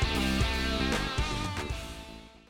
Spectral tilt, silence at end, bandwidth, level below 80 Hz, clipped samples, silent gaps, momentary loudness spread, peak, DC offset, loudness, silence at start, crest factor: -4.5 dB/octave; 0.1 s; 17.5 kHz; -36 dBFS; under 0.1%; none; 14 LU; -14 dBFS; under 0.1%; -30 LUFS; 0 s; 16 dB